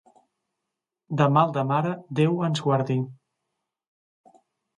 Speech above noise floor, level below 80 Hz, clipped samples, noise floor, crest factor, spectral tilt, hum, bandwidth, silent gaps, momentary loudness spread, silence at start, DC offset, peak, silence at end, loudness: 62 dB; -70 dBFS; under 0.1%; -85 dBFS; 20 dB; -7.5 dB/octave; none; 10.5 kHz; none; 9 LU; 1.1 s; under 0.1%; -6 dBFS; 1.65 s; -24 LUFS